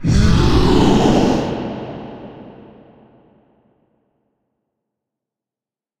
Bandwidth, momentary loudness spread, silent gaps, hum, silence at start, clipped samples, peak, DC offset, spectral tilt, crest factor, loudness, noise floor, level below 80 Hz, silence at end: 14 kHz; 22 LU; none; none; 0 s; under 0.1%; 0 dBFS; under 0.1%; -6.5 dB/octave; 18 dB; -15 LUFS; under -90 dBFS; -26 dBFS; 3.5 s